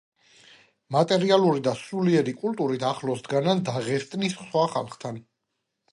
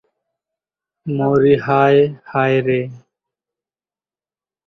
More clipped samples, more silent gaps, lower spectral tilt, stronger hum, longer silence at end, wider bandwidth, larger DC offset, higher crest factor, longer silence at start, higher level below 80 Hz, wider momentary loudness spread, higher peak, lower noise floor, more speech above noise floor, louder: neither; neither; second, -6 dB/octave vs -9 dB/octave; neither; second, 0.7 s vs 1.7 s; first, 11.5 kHz vs 6.2 kHz; neither; about the same, 20 dB vs 18 dB; second, 0.9 s vs 1.05 s; second, -70 dBFS vs -56 dBFS; about the same, 10 LU vs 12 LU; second, -6 dBFS vs -2 dBFS; second, -80 dBFS vs under -90 dBFS; second, 56 dB vs over 75 dB; second, -25 LUFS vs -16 LUFS